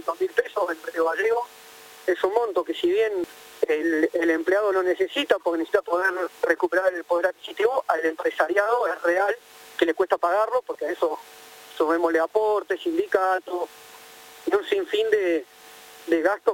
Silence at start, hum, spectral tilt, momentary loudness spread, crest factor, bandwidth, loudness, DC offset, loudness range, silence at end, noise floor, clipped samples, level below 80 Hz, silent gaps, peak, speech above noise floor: 0 s; none; -3 dB/octave; 12 LU; 20 dB; 17 kHz; -24 LUFS; under 0.1%; 2 LU; 0 s; -46 dBFS; under 0.1%; -68 dBFS; none; -4 dBFS; 23 dB